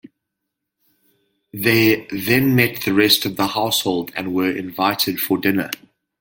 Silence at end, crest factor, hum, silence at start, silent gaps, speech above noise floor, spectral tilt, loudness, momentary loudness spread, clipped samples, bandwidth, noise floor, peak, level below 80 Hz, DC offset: 0.45 s; 20 dB; none; 1.55 s; none; 61 dB; -4 dB/octave; -18 LUFS; 9 LU; under 0.1%; 17 kHz; -80 dBFS; 0 dBFS; -56 dBFS; under 0.1%